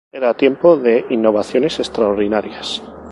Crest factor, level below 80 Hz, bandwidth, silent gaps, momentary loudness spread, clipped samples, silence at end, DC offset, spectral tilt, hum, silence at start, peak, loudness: 16 dB; -50 dBFS; 11.5 kHz; none; 12 LU; under 0.1%; 0 s; under 0.1%; -5.5 dB/octave; none; 0.15 s; 0 dBFS; -16 LUFS